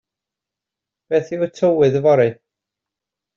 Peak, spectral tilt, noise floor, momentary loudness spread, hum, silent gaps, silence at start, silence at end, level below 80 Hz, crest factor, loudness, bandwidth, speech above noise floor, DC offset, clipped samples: -4 dBFS; -6.5 dB/octave; -86 dBFS; 7 LU; none; none; 1.1 s; 1.05 s; -62 dBFS; 16 dB; -17 LUFS; 7.4 kHz; 70 dB; under 0.1%; under 0.1%